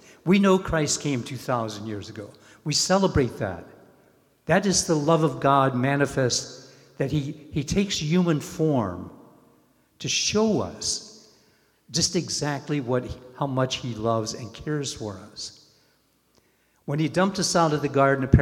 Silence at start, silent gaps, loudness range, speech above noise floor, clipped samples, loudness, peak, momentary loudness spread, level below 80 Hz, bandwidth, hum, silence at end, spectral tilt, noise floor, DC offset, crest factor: 0.25 s; none; 6 LU; 41 dB; under 0.1%; -24 LUFS; -2 dBFS; 16 LU; -44 dBFS; 16 kHz; none; 0 s; -4.5 dB/octave; -65 dBFS; under 0.1%; 24 dB